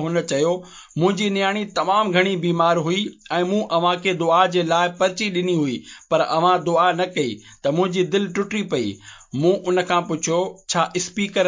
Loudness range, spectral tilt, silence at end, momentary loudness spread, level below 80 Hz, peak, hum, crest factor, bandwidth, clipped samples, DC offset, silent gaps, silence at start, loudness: 3 LU; -4.5 dB/octave; 0 s; 7 LU; -62 dBFS; -2 dBFS; none; 18 dB; 7.8 kHz; under 0.1%; under 0.1%; none; 0 s; -20 LUFS